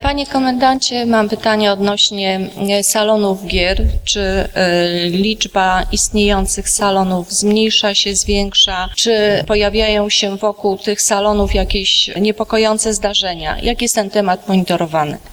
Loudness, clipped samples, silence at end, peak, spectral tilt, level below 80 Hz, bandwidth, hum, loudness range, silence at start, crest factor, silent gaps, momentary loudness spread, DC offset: -14 LUFS; under 0.1%; 0 s; 0 dBFS; -3 dB/octave; -26 dBFS; over 20 kHz; none; 2 LU; 0 s; 14 dB; none; 5 LU; under 0.1%